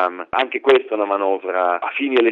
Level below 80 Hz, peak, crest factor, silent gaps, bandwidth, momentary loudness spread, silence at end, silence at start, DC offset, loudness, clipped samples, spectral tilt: -64 dBFS; -2 dBFS; 18 dB; none; 6.2 kHz; 5 LU; 0 s; 0 s; under 0.1%; -19 LUFS; under 0.1%; -5 dB/octave